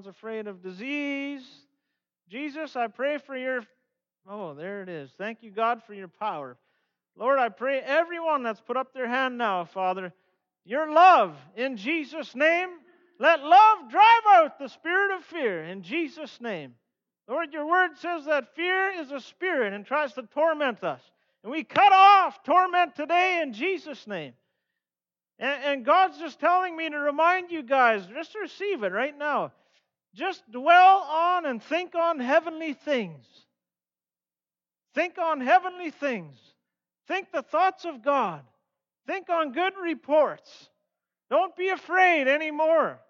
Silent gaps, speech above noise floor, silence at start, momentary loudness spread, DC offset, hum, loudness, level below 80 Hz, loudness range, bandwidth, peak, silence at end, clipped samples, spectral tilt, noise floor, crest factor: none; over 65 dB; 0.05 s; 18 LU; under 0.1%; none; -24 LUFS; -88 dBFS; 12 LU; 7 kHz; -8 dBFS; 0.15 s; under 0.1%; -4.5 dB/octave; under -90 dBFS; 18 dB